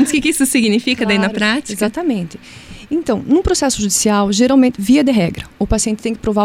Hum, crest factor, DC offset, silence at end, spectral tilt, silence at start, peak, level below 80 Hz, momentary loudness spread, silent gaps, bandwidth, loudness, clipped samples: none; 12 dB; under 0.1%; 0 s; -4 dB/octave; 0 s; -2 dBFS; -34 dBFS; 10 LU; none; 16.5 kHz; -15 LUFS; under 0.1%